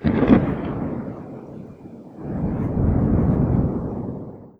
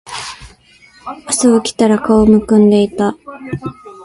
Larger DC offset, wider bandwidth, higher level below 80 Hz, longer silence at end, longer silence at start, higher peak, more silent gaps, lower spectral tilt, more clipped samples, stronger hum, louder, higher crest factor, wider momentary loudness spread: neither; second, 5 kHz vs 11.5 kHz; first, -32 dBFS vs -40 dBFS; about the same, 0.1 s vs 0 s; about the same, 0 s vs 0.05 s; about the same, 0 dBFS vs 0 dBFS; neither; first, -11 dB/octave vs -5.5 dB/octave; neither; neither; second, -22 LUFS vs -12 LUFS; first, 20 dB vs 14 dB; about the same, 21 LU vs 19 LU